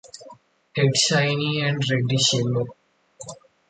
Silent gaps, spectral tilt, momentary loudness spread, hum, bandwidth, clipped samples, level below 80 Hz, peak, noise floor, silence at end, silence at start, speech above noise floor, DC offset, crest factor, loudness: none; -4 dB/octave; 21 LU; none; 9.6 kHz; under 0.1%; -60 dBFS; -6 dBFS; -49 dBFS; 0.35 s; 0.05 s; 28 dB; under 0.1%; 18 dB; -21 LUFS